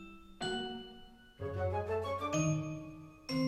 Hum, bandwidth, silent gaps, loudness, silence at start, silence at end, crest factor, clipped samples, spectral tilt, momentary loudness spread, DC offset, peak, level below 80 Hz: none; 14 kHz; none; -38 LUFS; 0 s; 0 s; 16 dB; under 0.1%; -5 dB/octave; 17 LU; under 0.1%; -22 dBFS; -60 dBFS